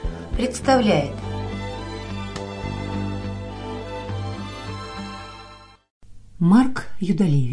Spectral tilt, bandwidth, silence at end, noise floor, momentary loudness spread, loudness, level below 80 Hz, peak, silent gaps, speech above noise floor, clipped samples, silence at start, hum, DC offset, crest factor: -6.5 dB/octave; 10.5 kHz; 0 s; -45 dBFS; 15 LU; -24 LUFS; -38 dBFS; -6 dBFS; 5.90-6.01 s; 27 dB; under 0.1%; 0 s; none; under 0.1%; 18 dB